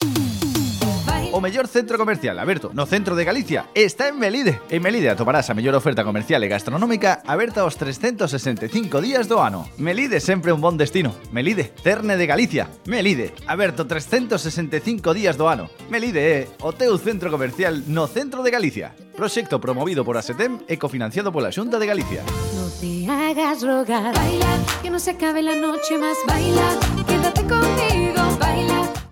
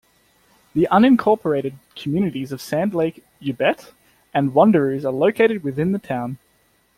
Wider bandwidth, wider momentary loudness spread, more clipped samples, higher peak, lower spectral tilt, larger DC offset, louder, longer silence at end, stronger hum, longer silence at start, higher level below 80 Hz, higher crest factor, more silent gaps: about the same, 17 kHz vs 15.5 kHz; second, 6 LU vs 15 LU; neither; about the same, -4 dBFS vs -2 dBFS; second, -5 dB/octave vs -7.5 dB/octave; neither; about the same, -21 LUFS vs -19 LUFS; second, 0.05 s vs 0.6 s; neither; second, 0 s vs 0.75 s; first, -38 dBFS vs -58 dBFS; about the same, 18 dB vs 18 dB; neither